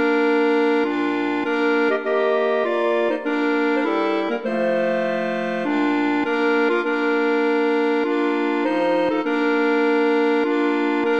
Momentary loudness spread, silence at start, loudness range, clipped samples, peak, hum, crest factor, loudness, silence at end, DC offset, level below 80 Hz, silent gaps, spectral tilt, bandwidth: 4 LU; 0 s; 1 LU; under 0.1%; -8 dBFS; none; 12 dB; -20 LUFS; 0 s; 0.3%; -68 dBFS; none; -6 dB/octave; 7.6 kHz